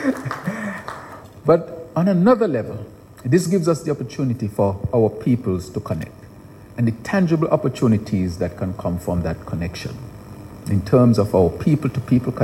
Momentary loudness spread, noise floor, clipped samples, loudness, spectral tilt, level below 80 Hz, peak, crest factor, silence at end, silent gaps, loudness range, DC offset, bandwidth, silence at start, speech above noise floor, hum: 17 LU; -41 dBFS; under 0.1%; -20 LUFS; -8 dB/octave; -44 dBFS; -4 dBFS; 16 dB; 0 s; none; 3 LU; under 0.1%; 16 kHz; 0 s; 22 dB; none